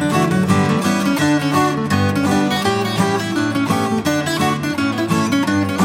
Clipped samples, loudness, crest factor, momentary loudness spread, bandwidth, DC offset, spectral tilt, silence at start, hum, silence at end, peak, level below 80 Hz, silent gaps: under 0.1%; -17 LUFS; 14 dB; 3 LU; 16 kHz; under 0.1%; -5.5 dB/octave; 0 s; none; 0 s; -2 dBFS; -50 dBFS; none